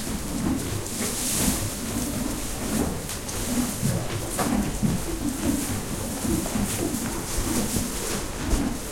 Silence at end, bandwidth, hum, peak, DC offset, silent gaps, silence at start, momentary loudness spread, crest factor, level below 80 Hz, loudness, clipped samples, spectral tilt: 0 s; 16.5 kHz; none; -8 dBFS; under 0.1%; none; 0 s; 5 LU; 18 dB; -36 dBFS; -27 LUFS; under 0.1%; -4 dB/octave